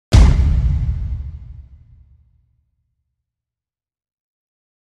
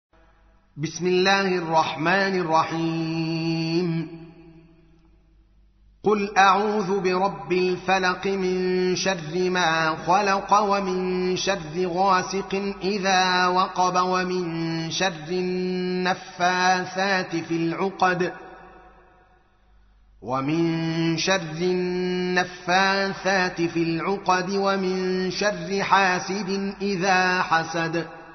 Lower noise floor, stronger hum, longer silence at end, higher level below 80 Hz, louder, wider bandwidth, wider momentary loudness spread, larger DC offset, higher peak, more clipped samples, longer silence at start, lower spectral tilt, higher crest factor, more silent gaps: first, under -90 dBFS vs -58 dBFS; neither; first, 3.3 s vs 0 s; first, -20 dBFS vs -56 dBFS; first, -17 LUFS vs -23 LUFS; first, 10 kHz vs 6.4 kHz; first, 23 LU vs 7 LU; neither; first, 0 dBFS vs -4 dBFS; neither; second, 0.1 s vs 0.75 s; first, -6.5 dB/octave vs -3.5 dB/octave; about the same, 18 dB vs 20 dB; neither